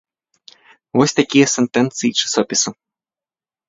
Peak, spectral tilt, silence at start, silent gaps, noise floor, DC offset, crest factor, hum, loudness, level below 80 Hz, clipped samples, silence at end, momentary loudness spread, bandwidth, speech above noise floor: 0 dBFS; -3.5 dB/octave; 0.95 s; none; under -90 dBFS; under 0.1%; 18 dB; none; -16 LUFS; -62 dBFS; under 0.1%; 0.95 s; 5 LU; 8 kHz; over 74 dB